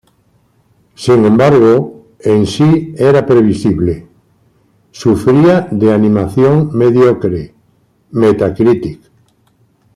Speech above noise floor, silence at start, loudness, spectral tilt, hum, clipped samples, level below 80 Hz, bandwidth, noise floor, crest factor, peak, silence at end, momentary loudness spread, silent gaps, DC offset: 44 dB; 1 s; -11 LUFS; -8 dB/octave; none; under 0.1%; -44 dBFS; 12 kHz; -54 dBFS; 10 dB; 0 dBFS; 1 s; 12 LU; none; under 0.1%